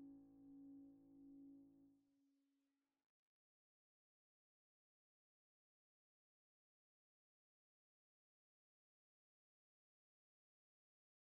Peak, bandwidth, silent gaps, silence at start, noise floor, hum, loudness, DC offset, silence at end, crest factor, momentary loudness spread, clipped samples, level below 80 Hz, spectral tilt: -54 dBFS; 1.2 kHz; none; 0 s; under -90 dBFS; none; -65 LUFS; under 0.1%; 8.65 s; 16 dB; 4 LU; under 0.1%; under -90 dBFS; -7 dB/octave